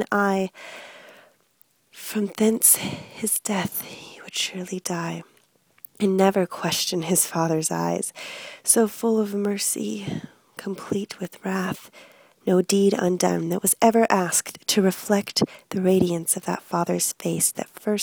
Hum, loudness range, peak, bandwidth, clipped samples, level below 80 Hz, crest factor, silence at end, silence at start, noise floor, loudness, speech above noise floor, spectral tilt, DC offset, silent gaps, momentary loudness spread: none; 5 LU; -2 dBFS; 19.5 kHz; under 0.1%; -64 dBFS; 22 dB; 0 s; 0 s; -62 dBFS; -23 LUFS; 39 dB; -3.5 dB/octave; under 0.1%; none; 15 LU